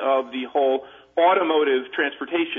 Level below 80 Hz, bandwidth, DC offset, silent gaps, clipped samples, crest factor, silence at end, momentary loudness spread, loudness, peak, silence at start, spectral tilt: -72 dBFS; 3.8 kHz; under 0.1%; none; under 0.1%; 14 dB; 0 s; 8 LU; -22 LUFS; -8 dBFS; 0 s; -6 dB/octave